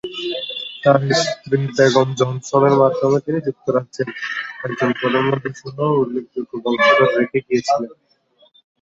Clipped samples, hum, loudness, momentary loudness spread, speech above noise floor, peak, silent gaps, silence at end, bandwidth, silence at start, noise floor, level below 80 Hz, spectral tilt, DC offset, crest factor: under 0.1%; none; -18 LUFS; 11 LU; 39 dB; 0 dBFS; none; 0.9 s; 8 kHz; 0.05 s; -57 dBFS; -60 dBFS; -5.5 dB/octave; under 0.1%; 18 dB